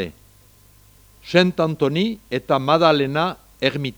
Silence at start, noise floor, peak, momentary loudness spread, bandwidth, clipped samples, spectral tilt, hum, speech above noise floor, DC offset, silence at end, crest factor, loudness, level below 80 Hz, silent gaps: 0 s; -51 dBFS; -2 dBFS; 8 LU; over 20 kHz; under 0.1%; -6.5 dB/octave; 50 Hz at -50 dBFS; 32 dB; under 0.1%; 0.05 s; 20 dB; -19 LUFS; -54 dBFS; none